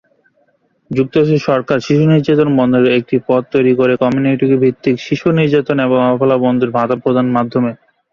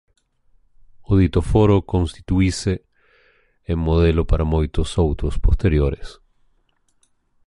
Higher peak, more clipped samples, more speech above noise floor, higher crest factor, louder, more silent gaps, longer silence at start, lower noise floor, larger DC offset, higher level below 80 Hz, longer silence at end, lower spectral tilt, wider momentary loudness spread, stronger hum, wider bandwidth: first, 0 dBFS vs -4 dBFS; neither; about the same, 46 dB vs 45 dB; about the same, 12 dB vs 16 dB; first, -13 LUFS vs -20 LUFS; neither; about the same, 0.9 s vs 1 s; second, -58 dBFS vs -63 dBFS; neither; second, -52 dBFS vs -26 dBFS; second, 0.4 s vs 1.35 s; about the same, -8 dB/octave vs -7.5 dB/octave; second, 5 LU vs 8 LU; neither; second, 7 kHz vs 11.5 kHz